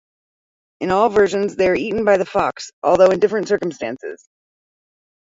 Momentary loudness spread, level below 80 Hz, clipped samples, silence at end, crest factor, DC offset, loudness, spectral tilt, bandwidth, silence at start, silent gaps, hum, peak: 13 LU; -52 dBFS; under 0.1%; 1.05 s; 18 dB; under 0.1%; -18 LUFS; -5.5 dB/octave; 7.8 kHz; 0.8 s; 2.73-2.82 s; none; -2 dBFS